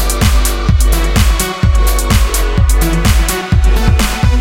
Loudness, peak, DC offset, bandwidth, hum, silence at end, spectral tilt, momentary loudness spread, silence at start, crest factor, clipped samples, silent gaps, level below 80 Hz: -12 LUFS; 0 dBFS; under 0.1%; 17 kHz; none; 0 s; -4.5 dB/octave; 1 LU; 0 s; 10 dB; under 0.1%; none; -12 dBFS